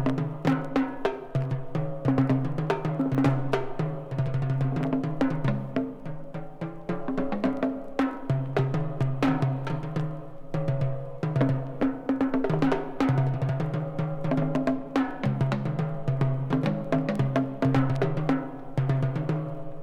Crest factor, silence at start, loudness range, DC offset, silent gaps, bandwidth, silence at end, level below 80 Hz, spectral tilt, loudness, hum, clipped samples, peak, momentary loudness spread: 18 dB; 0 s; 3 LU; under 0.1%; none; 8 kHz; 0 s; -48 dBFS; -9 dB/octave; -28 LUFS; none; under 0.1%; -8 dBFS; 7 LU